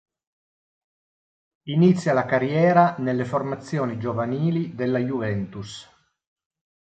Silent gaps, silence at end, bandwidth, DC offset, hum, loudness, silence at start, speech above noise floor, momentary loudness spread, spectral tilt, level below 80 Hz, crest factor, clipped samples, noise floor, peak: none; 1.1 s; 8.8 kHz; under 0.1%; none; -22 LUFS; 1.65 s; over 68 dB; 14 LU; -7.5 dB/octave; -60 dBFS; 20 dB; under 0.1%; under -90 dBFS; -4 dBFS